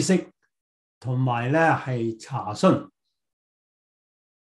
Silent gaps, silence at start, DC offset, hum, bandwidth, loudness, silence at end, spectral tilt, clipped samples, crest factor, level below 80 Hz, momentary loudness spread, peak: 0.61-1.01 s; 0 s; under 0.1%; none; 12 kHz; -24 LUFS; 1.6 s; -6 dB/octave; under 0.1%; 20 dB; -68 dBFS; 10 LU; -4 dBFS